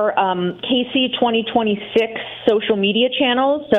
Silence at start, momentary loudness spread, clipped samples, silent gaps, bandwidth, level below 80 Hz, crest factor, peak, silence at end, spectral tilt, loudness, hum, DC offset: 0 s; 4 LU; under 0.1%; none; 6.6 kHz; -56 dBFS; 16 dB; -2 dBFS; 0 s; -6.5 dB/octave; -18 LUFS; none; under 0.1%